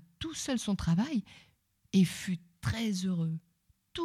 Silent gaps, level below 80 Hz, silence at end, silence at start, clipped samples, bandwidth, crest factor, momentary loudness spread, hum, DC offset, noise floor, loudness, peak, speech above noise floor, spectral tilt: none; -54 dBFS; 0 s; 0.2 s; under 0.1%; 15 kHz; 18 dB; 10 LU; none; under 0.1%; -56 dBFS; -33 LUFS; -16 dBFS; 25 dB; -5.5 dB/octave